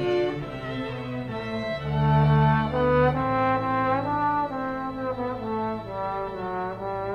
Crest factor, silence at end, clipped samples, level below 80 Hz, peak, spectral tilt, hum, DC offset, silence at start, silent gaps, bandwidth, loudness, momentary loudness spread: 14 dB; 0 s; under 0.1%; -44 dBFS; -10 dBFS; -8.5 dB/octave; none; under 0.1%; 0 s; none; 6.2 kHz; -26 LUFS; 11 LU